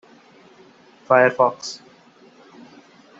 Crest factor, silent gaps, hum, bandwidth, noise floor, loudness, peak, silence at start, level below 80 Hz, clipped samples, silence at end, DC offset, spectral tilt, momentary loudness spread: 22 dB; none; none; 8 kHz; -51 dBFS; -18 LUFS; -2 dBFS; 1.1 s; -72 dBFS; under 0.1%; 1.45 s; under 0.1%; -4.5 dB/octave; 18 LU